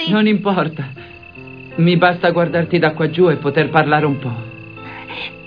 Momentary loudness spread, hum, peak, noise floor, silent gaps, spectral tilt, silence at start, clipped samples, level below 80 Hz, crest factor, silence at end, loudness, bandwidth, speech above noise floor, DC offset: 19 LU; none; 0 dBFS; -36 dBFS; none; -9 dB/octave; 0 s; under 0.1%; -54 dBFS; 16 dB; 0 s; -16 LUFS; 5.2 kHz; 21 dB; 0.2%